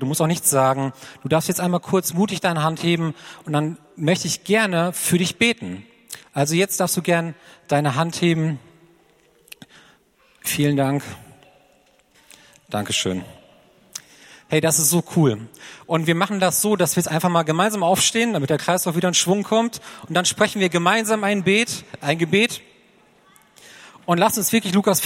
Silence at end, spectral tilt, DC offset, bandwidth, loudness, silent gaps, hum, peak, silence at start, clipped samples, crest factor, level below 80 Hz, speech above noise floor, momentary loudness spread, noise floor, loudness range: 0 s; -4 dB/octave; under 0.1%; 16.5 kHz; -20 LUFS; none; none; -2 dBFS; 0 s; under 0.1%; 20 dB; -62 dBFS; 38 dB; 13 LU; -58 dBFS; 8 LU